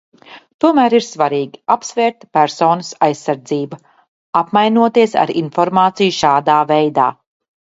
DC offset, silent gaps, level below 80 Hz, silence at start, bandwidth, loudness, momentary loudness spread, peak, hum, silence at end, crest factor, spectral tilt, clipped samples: under 0.1%; 0.54-0.59 s, 4.08-4.33 s; -60 dBFS; 0.3 s; 8 kHz; -15 LUFS; 7 LU; 0 dBFS; none; 0.65 s; 16 dB; -5 dB/octave; under 0.1%